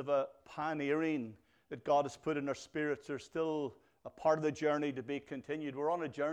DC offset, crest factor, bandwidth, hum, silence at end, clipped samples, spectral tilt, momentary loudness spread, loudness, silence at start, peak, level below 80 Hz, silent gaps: under 0.1%; 18 dB; 10.5 kHz; none; 0 s; under 0.1%; -6 dB/octave; 10 LU; -37 LUFS; 0 s; -18 dBFS; -76 dBFS; none